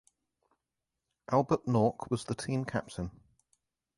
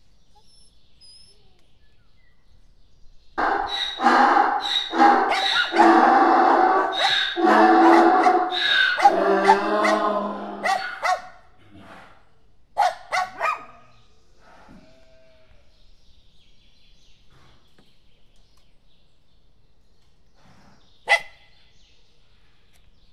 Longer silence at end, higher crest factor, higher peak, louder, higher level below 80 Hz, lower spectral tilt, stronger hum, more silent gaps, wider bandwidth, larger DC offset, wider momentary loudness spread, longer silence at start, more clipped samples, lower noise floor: second, 0.85 s vs 1.85 s; about the same, 20 dB vs 22 dB; second, -14 dBFS vs 0 dBFS; second, -32 LUFS vs -19 LUFS; about the same, -60 dBFS vs -56 dBFS; first, -7 dB/octave vs -3 dB/octave; neither; neither; second, 11.5 kHz vs 13 kHz; second, under 0.1% vs 0.3%; about the same, 12 LU vs 12 LU; second, 1.3 s vs 3.05 s; neither; first, -88 dBFS vs -60 dBFS